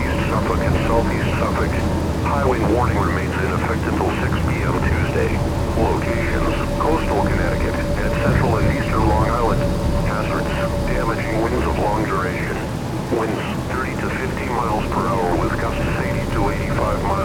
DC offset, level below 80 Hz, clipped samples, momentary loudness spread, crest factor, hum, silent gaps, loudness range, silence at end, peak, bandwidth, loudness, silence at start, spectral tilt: under 0.1%; -28 dBFS; under 0.1%; 4 LU; 14 dB; none; none; 3 LU; 0 s; -4 dBFS; 17.5 kHz; -20 LUFS; 0 s; -6.5 dB/octave